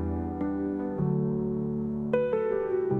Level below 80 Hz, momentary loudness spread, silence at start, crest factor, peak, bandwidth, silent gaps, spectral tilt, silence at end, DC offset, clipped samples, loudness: -50 dBFS; 4 LU; 0 s; 16 dB; -12 dBFS; 3.8 kHz; none; -11 dB/octave; 0 s; under 0.1%; under 0.1%; -29 LUFS